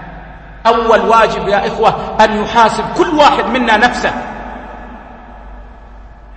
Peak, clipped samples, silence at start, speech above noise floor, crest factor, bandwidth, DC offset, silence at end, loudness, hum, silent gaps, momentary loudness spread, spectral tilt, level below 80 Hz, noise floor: 0 dBFS; 0.2%; 0 s; 23 dB; 14 dB; 9.8 kHz; under 0.1%; 0 s; -11 LUFS; none; none; 20 LU; -4.5 dB/octave; -34 dBFS; -34 dBFS